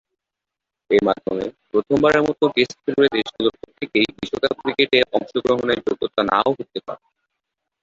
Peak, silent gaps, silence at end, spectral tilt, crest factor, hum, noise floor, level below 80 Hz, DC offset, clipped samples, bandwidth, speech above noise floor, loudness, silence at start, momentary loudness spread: -2 dBFS; none; 0.85 s; -5 dB/octave; 18 dB; none; -85 dBFS; -56 dBFS; under 0.1%; under 0.1%; 7.6 kHz; 65 dB; -20 LUFS; 0.9 s; 10 LU